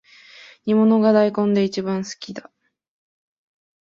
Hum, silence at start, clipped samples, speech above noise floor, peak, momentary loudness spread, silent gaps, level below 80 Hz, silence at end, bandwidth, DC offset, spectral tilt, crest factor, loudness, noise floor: none; 0.65 s; under 0.1%; 28 dB; -4 dBFS; 18 LU; none; -66 dBFS; 1.4 s; 7.4 kHz; under 0.1%; -6.5 dB/octave; 16 dB; -19 LUFS; -46 dBFS